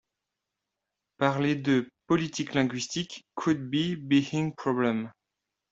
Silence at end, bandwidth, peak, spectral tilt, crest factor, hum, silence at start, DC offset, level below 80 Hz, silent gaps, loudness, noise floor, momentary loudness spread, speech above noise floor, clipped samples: 0.6 s; 8 kHz; -8 dBFS; -5.5 dB/octave; 22 dB; none; 1.2 s; under 0.1%; -66 dBFS; none; -28 LUFS; -86 dBFS; 7 LU; 59 dB; under 0.1%